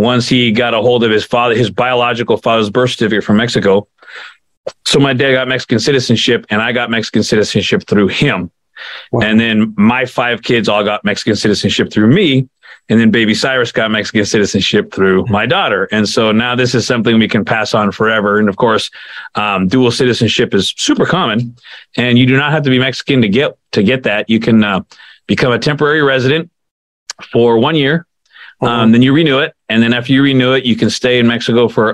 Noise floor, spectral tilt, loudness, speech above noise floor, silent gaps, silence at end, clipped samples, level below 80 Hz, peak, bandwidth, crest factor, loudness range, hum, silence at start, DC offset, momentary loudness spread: -40 dBFS; -5 dB/octave; -12 LUFS; 28 dB; 4.57-4.64 s, 26.71-27.06 s; 0 s; under 0.1%; -48 dBFS; 0 dBFS; 11.5 kHz; 12 dB; 2 LU; none; 0 s; under 0.1%; 6 LU